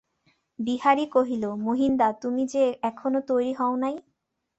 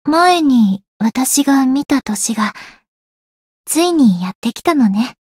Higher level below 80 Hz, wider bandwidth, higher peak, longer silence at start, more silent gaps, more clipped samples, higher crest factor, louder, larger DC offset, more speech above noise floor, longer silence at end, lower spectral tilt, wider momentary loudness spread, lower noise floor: second, -64 dBFS vs -56 dBFS; second, 8.2 kHz vs 16.5 kHz; second, -8 dBFS vs -2 dBFS; first, 0.6 s vs 0.05 s; second, none vs 0.88-1.00 s, 2.88-3.64 s, 4.35-4.42 s; neither; about the same, 18 dB vs 14 dB; second, -25 LUFS vs -14 LUFS; neither; second, 44 dB vs over 76 dB; first, 0.6 s vs 0.2 s; first, -5.5 dB/octave vs -4 dB/octave; about the same, 7 LU vs 8 LU; second, -69 dBFS vs under -90 dBFS